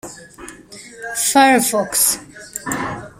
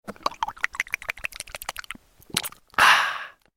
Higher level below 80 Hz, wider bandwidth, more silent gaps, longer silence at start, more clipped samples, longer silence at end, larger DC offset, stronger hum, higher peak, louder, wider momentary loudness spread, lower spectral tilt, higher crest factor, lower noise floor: about the same, -52 dBFS vs -54 dBFS; about the same, 16 kHz vs 17 kHz; neither; about the same, 0.05 s vs 0.1 s; neither; second, 0.1 s vs 0.3 s; neither; neither; about the same, -2 dBFS vs 0 dBFS; first, -16 LUFS vs -24 LUFS; first, 25 LU vs 18 LU; first, -2 dB/octave vs -0.5 dB/octave; second, 18 dB vs 26 dB; second, -39 dBFS vs -44 dBFS